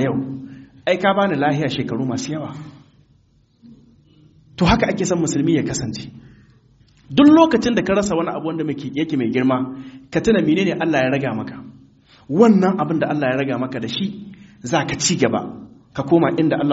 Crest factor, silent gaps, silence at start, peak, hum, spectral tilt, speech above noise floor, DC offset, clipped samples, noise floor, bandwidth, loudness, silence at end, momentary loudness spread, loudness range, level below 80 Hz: 20 dB; none; 0 s; 0 dBFS; none; -5 dB/octave; 39 dB; under 0.1%; under 0.1%; -57 dBFS; 8 kHz; -18 LUFS; 0 s; 18 LU; 5 LU; -44 dBFS